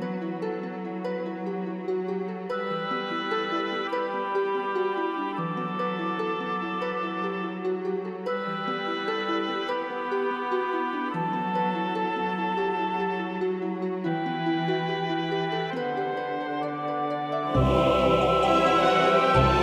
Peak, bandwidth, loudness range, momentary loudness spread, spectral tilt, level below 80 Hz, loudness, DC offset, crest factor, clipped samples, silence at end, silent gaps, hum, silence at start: -8 dBFS; 11.5 kHz; 5 LU; 10 LU; -6.5 dB/octave; -46 dBFS; -27 LUFS; under 0.1%; 18 dB; under 0.1%; 0 s; none; none; 0 s